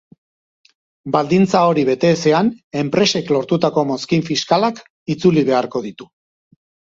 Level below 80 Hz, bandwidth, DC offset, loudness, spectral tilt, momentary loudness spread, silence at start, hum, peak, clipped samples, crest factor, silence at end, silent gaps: -56 dBFS; 7.8 kHz; under 0.1%; -17 LUFS; -5.5 dB/octave; 10 LU; 1.05 s; none; 0 dBFS; under 0.1%; 18 dB; 0.9 s; 2.64-2.71 s, 4.90-5.06 s